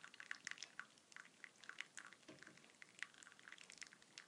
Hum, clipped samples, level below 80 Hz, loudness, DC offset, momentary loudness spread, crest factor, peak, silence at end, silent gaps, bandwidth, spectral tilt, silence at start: none; under 0.1%; under -90 dBFS; -57 LUFS; under 0.1%; 10 LU; 32 dB; -28 dBFS; 0 s; none; 11 kHz; 0 dB/octave; 0 s